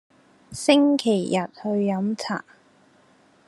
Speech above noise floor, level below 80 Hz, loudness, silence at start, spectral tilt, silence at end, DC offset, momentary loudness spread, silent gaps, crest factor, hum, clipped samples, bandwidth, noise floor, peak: 36 dB; -68 dBFS; -23 LUFS; 0.5 s; -5 dB/octave; 1.05 s; under 0.1%; 12 LU; none; 20 dB; none; under 0.1%; 12 kHz; -57 dBFS; -4 dBFS